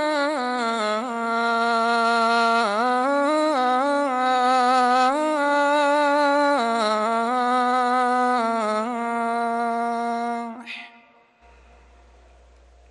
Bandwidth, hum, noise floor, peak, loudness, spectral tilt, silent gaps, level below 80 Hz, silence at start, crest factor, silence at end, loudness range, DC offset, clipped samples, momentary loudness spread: 12 kHz; none; -54 dBFS; -10 dBFS; -21 LUFS; -3 dB/octave; none; -62 dBFS; 0 s; 12 dB; 2.05 s; 8 LU; under 0.1%; under 0.1%; 6 LU